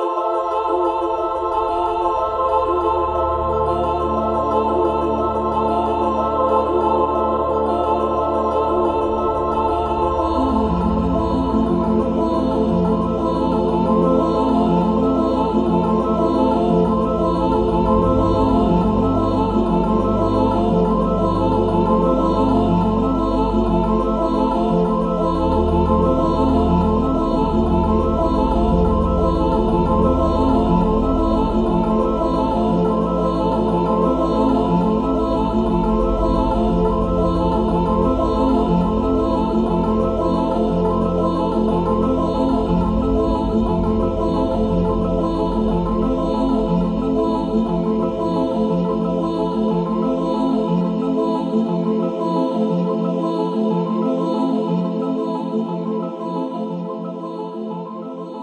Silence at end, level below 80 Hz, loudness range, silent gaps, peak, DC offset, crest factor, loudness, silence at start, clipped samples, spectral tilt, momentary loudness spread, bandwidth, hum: 0 s; -28 dBFS; 2 LU; none; -4 dBFS; under 0.1%; 14 dB; -18 LUFS; 0 s; under 0.1%; -9 dB/octave; 3 LU; 9.6 kHz; none